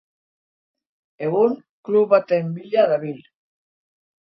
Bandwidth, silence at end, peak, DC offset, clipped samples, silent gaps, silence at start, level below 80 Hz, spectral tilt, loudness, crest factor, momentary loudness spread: 5.8 kHz; 1.05 s; -4 dBFS; under 0.1%; under 0.1%; 1.69-1.83 s; 1.2 s; -72 dBFS; -9.5 dB/octave; -20 LUFS; 20 dB; 15 LU